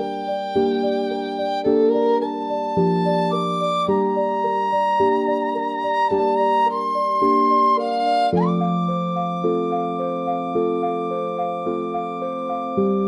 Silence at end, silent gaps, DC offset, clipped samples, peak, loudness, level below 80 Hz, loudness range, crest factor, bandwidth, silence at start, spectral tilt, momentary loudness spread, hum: 0 s; none; under 0.1%; under 0.1%; -8 dBFS; -21 LUFS; -64 dBFS; 4 LU; 14 dB; 11 kHz; 0 s; -7.5 dB/octave; 7 LU; none